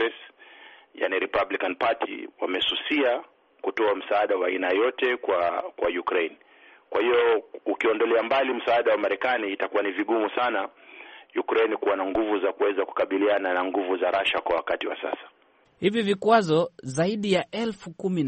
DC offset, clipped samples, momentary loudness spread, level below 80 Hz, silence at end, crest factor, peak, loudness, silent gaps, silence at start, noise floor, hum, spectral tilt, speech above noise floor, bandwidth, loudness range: under 0.1%; under 0.1%; 10 LU; -64 dBFS; 0 s; 18 dB; -6 dBFS; -25 LUFS; none; 0 s; -50 dBFS; none; -5.5 dB/octave; 25 dB; 8.4 kHz; 2 LU